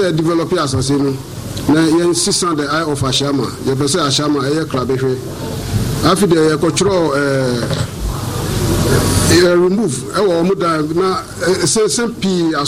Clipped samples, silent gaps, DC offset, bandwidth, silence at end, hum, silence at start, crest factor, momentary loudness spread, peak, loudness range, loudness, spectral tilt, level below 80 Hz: under 0.1%; none; under 0.1%; 16 kHz; 0 s; none; 0 s; 14 dB; 8 LU; 0 dBFS; 2 LU; -15 LUFS; -4.5 dB/octave; -32 dBFS